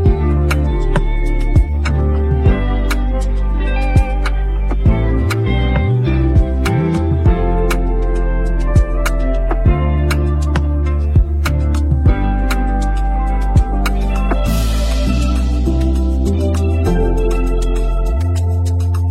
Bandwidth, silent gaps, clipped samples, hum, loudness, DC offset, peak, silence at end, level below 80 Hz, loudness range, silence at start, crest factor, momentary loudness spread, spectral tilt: 14 kHz; none; under 0.1%; none; -16 LUFS; under 0.1%; -2 dBFS; 0 s; -16 dBFS; 1 LU; 0 s; 12 dB; 4 LU; -7 dB/octave